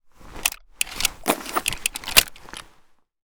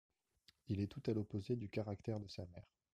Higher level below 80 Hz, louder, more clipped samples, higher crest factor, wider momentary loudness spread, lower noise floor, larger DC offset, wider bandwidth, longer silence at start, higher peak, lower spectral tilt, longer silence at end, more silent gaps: first, -44 dBFS vs -70 dBFS; first, -22 LUFS vs -44 LUFS; neither; first, 26 dB vs 18 dB; first, 19 LU vs 11 LU; second, -56 dBFS vs -75 dBFS; neither; first, over 20 kHz vs 9.4 kHz; second, 0.2 s vs 0.7 s; first, 0 dBFS vs -26 dBFS; second, -0.5 dB/octave vs -8 dB/octave; first, 0.65 s vs 0.3 s; neither